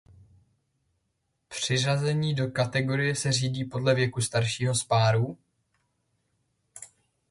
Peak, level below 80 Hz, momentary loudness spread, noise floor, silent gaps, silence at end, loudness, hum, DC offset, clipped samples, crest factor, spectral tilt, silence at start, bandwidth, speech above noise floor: -10 dBFS; -60 dBFS; 10 LU; -77 dBFS; none; 0.45 s; -26 LUFS; none; under 0.1%; under 0.1%; 20 dB; -4.5 dB/octave; 1.5 s; 11.5 kHz; 51 dB